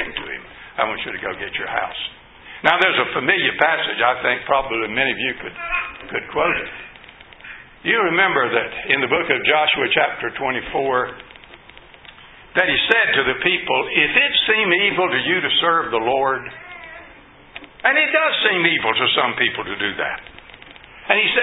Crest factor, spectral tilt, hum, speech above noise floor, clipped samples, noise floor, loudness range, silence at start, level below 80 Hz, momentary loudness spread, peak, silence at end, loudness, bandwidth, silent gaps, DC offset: 20 dB; -5.5 dB/octave; none; 26 dB; under 0.1%; -45 dBFS; 5 LU; 0 s; -52 dBFS; 17 LU; 0 dBFS; 0 s; -18 LUFS; 8 kHz; none; under 0.1%